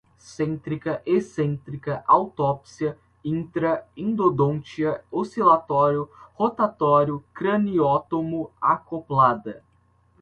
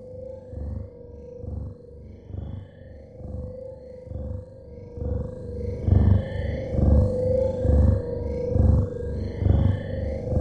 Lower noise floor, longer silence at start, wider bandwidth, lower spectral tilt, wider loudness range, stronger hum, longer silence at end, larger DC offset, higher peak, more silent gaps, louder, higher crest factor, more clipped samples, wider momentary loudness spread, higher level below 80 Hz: first, -61 dBFS vs -44 dBFS; first, 0.3 s vs 0 s; first, 9.2 kHz vs 4.6 kHz; second, -8 dB/octave vs -10.5 dB/octave; second, 3 LU vs 16 LU; neither; first, 0.65 s vs 0 s; neither; about the same, -4 dBFS vs -6 dBFS; neither; about the same, -23 LUFS vs -25 LUFS; about the same, 20 dB vs 18 dB; neither; second, 10 LU vs 21 LU; second, -58 dBFS vs -30 dBFS